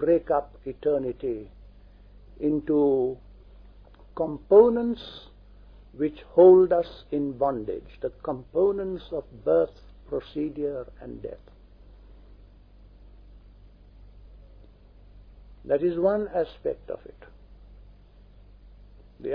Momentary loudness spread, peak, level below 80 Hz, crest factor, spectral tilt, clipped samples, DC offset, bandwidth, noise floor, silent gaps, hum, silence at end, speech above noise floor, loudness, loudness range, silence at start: 21 LU; -6 dBFS; -50 dBFS; 22 dB; -10 dB/octave; under 0.1%; under 0.1%; 5.2 kHz; -52 dBFS; none; none; 0 s; 27 dB; -25 LUFS; 15 LU; 0 s